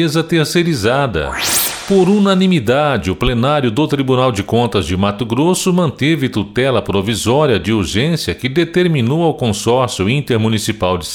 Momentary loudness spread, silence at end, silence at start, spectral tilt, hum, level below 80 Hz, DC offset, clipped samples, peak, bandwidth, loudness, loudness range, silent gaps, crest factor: 4 LU; 0 s; 0 s; -5 dB/octave; none; -36 dBFS; under 0.1%; under 0.1%; -2 dBFS; 19.5 kHz; -14 LUFS; 1 LU; none; 12 dB